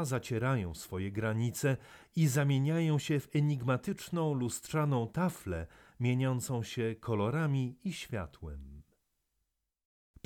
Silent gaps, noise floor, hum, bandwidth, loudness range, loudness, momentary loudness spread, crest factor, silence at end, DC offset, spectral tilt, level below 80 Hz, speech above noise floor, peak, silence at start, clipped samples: none; -84 dBFS; none; 18 kHz; 5 LU; -33 LUFS; 10 LU; 16 dB; 1.45 s; under 0.1%; -6.5 dB/octave; -58 dBFS; 51 dB; -18 dBFS; 0 s; under 0.1%